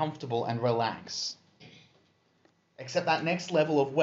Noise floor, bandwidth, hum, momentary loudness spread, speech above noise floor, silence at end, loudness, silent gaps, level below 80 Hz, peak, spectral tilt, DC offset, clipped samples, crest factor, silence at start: -68 dBFS; 8 kHz; none; 9 LU; 39 dB; 0 s; -30 LUFS; none; -76 dBFS; -12 dBFS; -4 dB/octave; under 0.1%; under 0.1%; 18 dB; 0 s